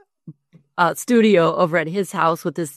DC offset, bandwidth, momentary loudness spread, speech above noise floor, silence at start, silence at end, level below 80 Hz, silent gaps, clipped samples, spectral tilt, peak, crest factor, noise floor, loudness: under 0.1%; 13.5 kHz; 9 LU; 26 dB; 0.25 s; 0.05 s; -66 dBFS; none; under 0.1%; -5.5 dB/octave; -2 dBFS; 16 dB; -44 dBFS; -18 LUFS